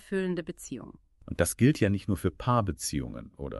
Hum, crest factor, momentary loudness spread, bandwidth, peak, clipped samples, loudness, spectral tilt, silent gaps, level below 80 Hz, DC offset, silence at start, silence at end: none; 20 dB; 17 LU; 12 kHz; -10 dBFS; under 0.1%; -29 LUFS; -5.5 dB/octave; none; -48 dBFS; under 0.1%; 0.1 s; 0 s